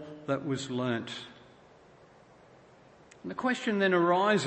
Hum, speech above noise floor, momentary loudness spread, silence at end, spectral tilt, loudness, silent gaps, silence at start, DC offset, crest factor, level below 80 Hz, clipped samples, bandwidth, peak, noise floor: none; 28 dB; 17 LU; 0 s; -5.5 dB/octave; -30 LUFS; none; 0 s; under 0.1%; 18 dB; -72 dBFS; under 0.1%; 8.8 kHz; -14 dBFS; -57 dBFS